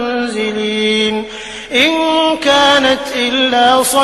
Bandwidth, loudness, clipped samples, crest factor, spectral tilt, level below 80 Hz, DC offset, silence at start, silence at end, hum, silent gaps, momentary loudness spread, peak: 15 kHz; -12 LUFS; under 0.1%; 12 dB; -2 dB/octave; -46 dBFS; under 0.1%; 0 s; 0 s; none; none; 8 LU; 0 dBFS